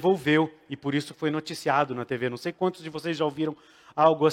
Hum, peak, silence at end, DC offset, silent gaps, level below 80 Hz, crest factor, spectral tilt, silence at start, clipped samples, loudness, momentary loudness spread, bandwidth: none; -6 dBFS; 0 s; under 0.1%; none; -70 dBFS; 20 dB; -6 dB/octave; 0 s; under 0.1%; -27 LUFS; 10 LU; 15.5 kHz